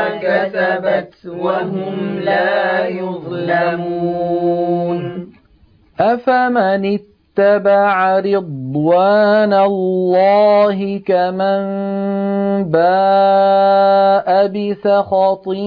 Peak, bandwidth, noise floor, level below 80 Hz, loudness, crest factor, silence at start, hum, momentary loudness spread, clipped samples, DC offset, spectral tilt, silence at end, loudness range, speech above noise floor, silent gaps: -2 dBFS; 5.2 kHz; -50 dBFS; -58 dBFS; -15 LUFS; 14 dB; 0 s; none; 9 LU; under 0.1%; under 0.1%; -9 dB/octave; 0 s; 5 LU; 36 dB; none